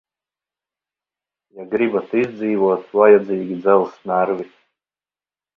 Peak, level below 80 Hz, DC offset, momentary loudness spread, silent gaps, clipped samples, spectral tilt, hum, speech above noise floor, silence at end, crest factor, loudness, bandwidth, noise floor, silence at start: 0 dBFS; -68 dBFS; under 0.1%; 11 LU; none; under 0.1%; -9 dB/octave; 50 Hz at -55 dBFS; over 73 dB; 1.1 s; 20 dB; -18 LUFS; 4.6 kHz; under -90 dBFS; 1.55 s